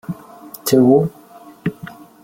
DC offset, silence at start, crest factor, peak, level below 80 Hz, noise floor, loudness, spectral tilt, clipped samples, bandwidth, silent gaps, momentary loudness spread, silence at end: under 0.1%; 0.1 s; 16 dB; -2 dBFS; -54 dBFS; -41 dBFS; -17 LUFS; -6.5 dB/octave; under 0.1%; 16.5 kHz; none; 24 LU; 0.3 s